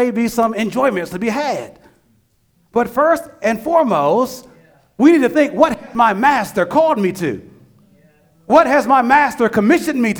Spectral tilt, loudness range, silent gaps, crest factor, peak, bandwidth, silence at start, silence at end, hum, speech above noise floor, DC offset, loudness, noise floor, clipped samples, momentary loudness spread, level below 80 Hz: -5.5 dB/octave; 4 LU; none; 16 dB; 0 dBFS; over 20 kHz; 0 s; 0 s; none; 45 dB; under 0.1%; -15 LUFS; -59 dBFS; under 0.1%; 10 LU; -52 dBFS